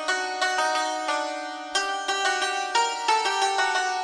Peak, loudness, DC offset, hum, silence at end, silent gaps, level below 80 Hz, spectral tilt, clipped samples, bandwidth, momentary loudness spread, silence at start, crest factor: -10 dBFS; -24 LUFS; under 0.1%; none; 0 s; none; -70 dBFS; 1.5 dB/octave; under 0.1%; 11 kHz; 5 LU; 0 s; 16 dB